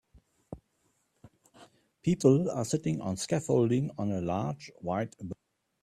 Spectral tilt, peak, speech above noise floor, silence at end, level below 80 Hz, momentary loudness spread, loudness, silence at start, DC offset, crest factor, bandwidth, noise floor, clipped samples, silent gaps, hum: -6.5 dB/octave; -10 dBFS; 45 dB; 0.5 s; -64 dBFS; 23 LU; -30 LUFS; 0.5 s; under 0.1%; 22 dB; 13.5 kHz; -74 dBFS; under 0.1%; none; none